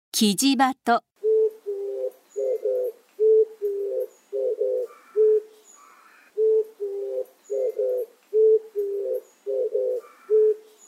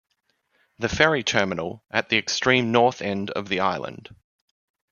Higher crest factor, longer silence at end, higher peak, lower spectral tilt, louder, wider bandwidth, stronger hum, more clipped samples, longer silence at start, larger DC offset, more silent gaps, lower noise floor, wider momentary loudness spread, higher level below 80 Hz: about the same, 18 dB vs 22 dB; second, 0.3 s vs 0.9 s; second, -6 dBFS vs -2 dBFS; about the same, -3.5 dB/octave vs -4 dB/octave; about the same, -24 LUFS vs -22 LUFS; first, 16 kHz vs 7.2 kHz; neither; neither; second, 0.15 s vs 0.8 s; neither; neither; second, -53 dBFS vs -70 dBFS; about the same, 12 LU vs 11 LU; second, -86 dBFS vs -52 dBFS